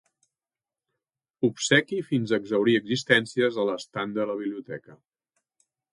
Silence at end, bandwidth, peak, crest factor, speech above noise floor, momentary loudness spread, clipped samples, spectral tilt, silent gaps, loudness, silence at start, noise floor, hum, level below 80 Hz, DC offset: 1 s; 11.5 kHz; -4 dBFS; 22 dB; over 65 dB; 11 LU; under 0.1%; -4.5 dB/octave; none; -25 LUFS; 1.4 s; under -90 dBFS; none; -72 dBFS; under 0.1%